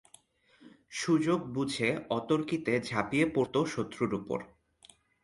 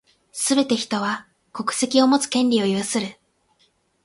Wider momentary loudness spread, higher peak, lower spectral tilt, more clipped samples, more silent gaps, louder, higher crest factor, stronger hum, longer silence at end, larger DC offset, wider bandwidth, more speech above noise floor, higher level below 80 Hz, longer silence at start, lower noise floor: second, 8 LU vs 14 LU; second, -12 dBFS vs -4 dBFS; first, -5.5 dB/octave vs -3.5 dB/octave; neither; neither; second, -31 LUFS vs -21 LUFS; about the same, 20 dB vs 20 dB; neither; about the same, 0.8 s vs 0.9 s; neither; about the same, 11.5 kHz vs 11.5 kHz; second, 33 dB vs 44 dB; about the same, -66 dBFS vs -66 dBFS; first, 0.6 s vs 0.35 s; about the same, -64 dBFS vs -64 dBFS